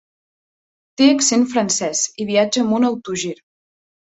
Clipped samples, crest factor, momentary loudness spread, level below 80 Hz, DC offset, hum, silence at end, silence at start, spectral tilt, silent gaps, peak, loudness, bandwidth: under 0.1%; 18 dB; 11 LU; -62 dBFS; under 0.1%; none; 0.7 s; 1 s; -3 dB/octave; none; -2 dBFS; -17 LUFS; 8.2 kHz